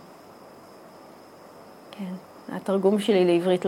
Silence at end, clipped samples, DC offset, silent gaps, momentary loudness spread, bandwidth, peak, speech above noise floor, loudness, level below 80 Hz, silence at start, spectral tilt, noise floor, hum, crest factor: 0 s; under 0.1%; under 0.1%; none; 27 LU; 15.5 kHz; -8 dBFS; 25 dB; -24 LUFS; -76 dBFS; 0.1 s; -6.5 dB/octave; -48 dBFS; none; 18 dB